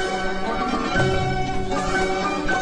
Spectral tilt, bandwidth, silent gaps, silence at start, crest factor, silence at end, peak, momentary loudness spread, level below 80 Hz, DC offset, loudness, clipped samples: -5 dB/octave; 10.5 kHz; none; 0 s; 14 dB; 0 s; -8 dBFS; 4 LU; -34 dBFS; under 0.1%; -23 LUFS; under 0.1%